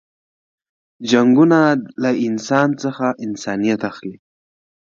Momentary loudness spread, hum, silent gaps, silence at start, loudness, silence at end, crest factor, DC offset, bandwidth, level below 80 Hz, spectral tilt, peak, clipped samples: 14 LU; none; none; 1 s; -17 LUFS; 0.7 s; 18 dB; under 0.1%; 7.6 kHz; -64 dBFS; -6 dB/octave; 0 dBFS; under 0.1%